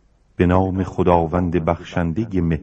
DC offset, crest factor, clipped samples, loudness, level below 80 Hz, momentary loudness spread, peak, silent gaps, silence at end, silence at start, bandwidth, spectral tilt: under 0.1%; 18 dB; under 0.1%; -19 LUFS; -40 dBFS; 6 LU; -2 dBFS; none; 0 s; 0.4 s; 7.6 kHz; -9 dB/octave